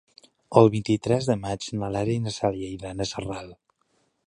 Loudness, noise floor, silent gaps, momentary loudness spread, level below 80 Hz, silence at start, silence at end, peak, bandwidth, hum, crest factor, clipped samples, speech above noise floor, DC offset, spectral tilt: -25 LUFS; -70 dBFS; none; 15 LU; -52 dBFS; 0.5 s; 0.75 s; -2 dBFS; 10.5 kHz; none; 24 dB; under 0.1%; 46 dB; under 0.1%; -6.5 dB/octave